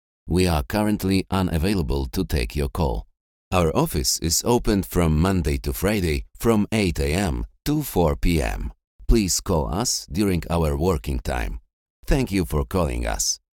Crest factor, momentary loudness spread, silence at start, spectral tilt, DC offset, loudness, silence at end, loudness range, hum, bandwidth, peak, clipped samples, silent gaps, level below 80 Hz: 18 dB; 6 LU; 0.25 s; -5 dB/octave; under 0.1%; -23 LUFS; 0.15 s; 3 LU; none; 18.5 kHz; -4 dBFS; under 0.1%; 3.21-3.51 s, 8.87-8.99 s, 11.73-12.03 s; -30 dBFS